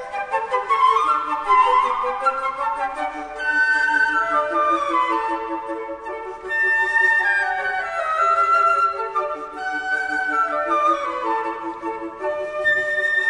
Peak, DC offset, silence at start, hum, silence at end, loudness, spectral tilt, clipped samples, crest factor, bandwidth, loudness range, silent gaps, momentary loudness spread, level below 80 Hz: -6 dBFS; under 0.1%; 0 s; none; 0 s; -20 LUFS; -2.5 dB/octave; under 0.1%; 14 dB; 10 kHz; 3 LU; none; 12 LU; -56 dBFS